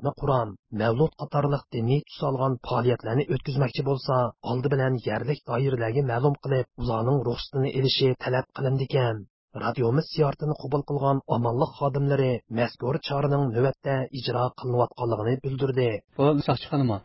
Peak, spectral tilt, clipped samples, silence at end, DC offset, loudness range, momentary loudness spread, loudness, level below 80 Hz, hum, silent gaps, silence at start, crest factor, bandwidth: -8 dBFS; -11 dB/octave; under 0.1%; 0.05 s; under 0.1%; 1 LU; 5 LU; -26 LUFS; -52 dBFS; none; 0.59-0.63 s, 9.30-9.48 s; 0 s; 18 dB; 5.8 kHz